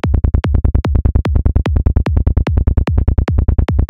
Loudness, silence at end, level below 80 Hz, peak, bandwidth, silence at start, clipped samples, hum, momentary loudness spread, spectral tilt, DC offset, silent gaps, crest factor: -15 LUFS; 0 s; -14 dBFS; -2 dBFS; 5.6 kHz; 0 s; under 0.1%; none; 0 LU; -9 dB/octave; 2%; none; 10 dB